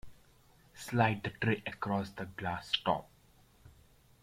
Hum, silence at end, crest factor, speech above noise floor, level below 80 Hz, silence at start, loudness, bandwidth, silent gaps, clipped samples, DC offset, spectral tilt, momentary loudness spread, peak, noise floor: none; 0.5 s; 22 dB; 30 dB; -64 dBFS; 0.05 s; -34 LUFS; 16 kHz; none; under 0.1%; under 0.1%; -5.5 dB/octave; 9 LU; -14 dBFS; -64 dBFS